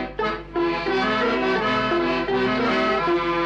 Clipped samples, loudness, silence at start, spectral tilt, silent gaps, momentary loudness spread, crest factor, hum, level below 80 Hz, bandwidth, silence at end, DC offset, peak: under 0.1%; -22 LUFS; 0 s; -5.5 dB/octave; none; 4 LU; 10 dB; 50 Hz at -45 dBFS; -44 dBFS; 8.2 kHz; 0 s; under 0.1%; -12 dBFS